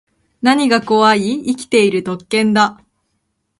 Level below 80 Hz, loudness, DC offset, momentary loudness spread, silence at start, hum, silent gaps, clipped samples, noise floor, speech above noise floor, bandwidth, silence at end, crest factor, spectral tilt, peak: -58 dBFS; -14 LUFS; under 0.1%; 7 LU; 0.45 s; none; none; under 0.1%; -69 dBFS; 55 dB; 11.5 kHz; 0.85 s; 16 dB; -4.5 dB/octave; 0 dBFS